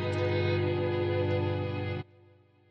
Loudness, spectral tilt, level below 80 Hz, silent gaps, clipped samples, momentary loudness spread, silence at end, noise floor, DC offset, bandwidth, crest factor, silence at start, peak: -30 LUFS; -8.5 dB/octave; -68 dBFS; none; under 0.1%; 8 LU; 0.65 s; -60 dBFS; under 0.1%; 7.8 kHz; 12 dB; 0 s; -18 dBFS